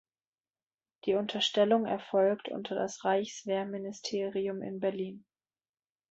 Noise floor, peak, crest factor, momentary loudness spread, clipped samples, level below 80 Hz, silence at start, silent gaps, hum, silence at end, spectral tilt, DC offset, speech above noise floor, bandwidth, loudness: under -90 dBFS; -14 dBFS; 18 dB; 10 LU; under 0.1%; -78 dBFS; 1.05 s; none; none; 0.9 s; -4.5 dB/octave; under 0.1%; over 59 dB; 8 kHz; -32 LUFS